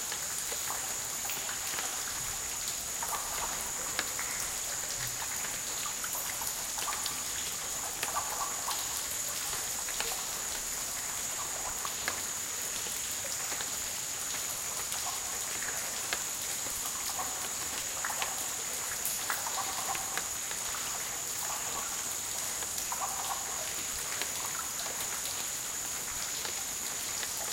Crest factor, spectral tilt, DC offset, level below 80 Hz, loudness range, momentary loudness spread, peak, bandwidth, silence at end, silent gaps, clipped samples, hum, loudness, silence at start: 26 dB; 0.5 dB/octave; under 0.1%; -60 dBFS; 1 LU; 1 LU; -10 dBFS; 17 kHz; 0 s; none; under 0.1%; none; -33 LUFS; 0 s